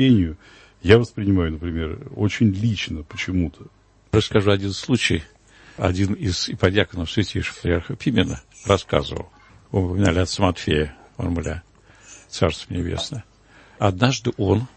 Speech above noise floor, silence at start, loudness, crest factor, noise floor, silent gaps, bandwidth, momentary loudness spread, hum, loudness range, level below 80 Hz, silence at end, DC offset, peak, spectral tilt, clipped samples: 30 dB; 0 s; -22 LUFS; 22 dB; -50 dBFS; none; 8.8 kHz; 10 LU; none; 3 LU; -40 dBFS; 0.1 s; under 0.1%; 0 dBFS; -6 dB/octave; under 0.1%